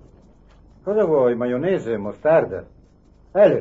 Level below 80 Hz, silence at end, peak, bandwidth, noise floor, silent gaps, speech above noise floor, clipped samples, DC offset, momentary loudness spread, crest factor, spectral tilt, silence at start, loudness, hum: -52 dBFS; 0 s; -4 dBFS; 7.6 kHz; -52 dBFS; none; 32 dB; under 0.1%; under 0.1%; 11 LU; 16 dB; -8.5 dB/octave; 0.85 s; -20 LUFS; none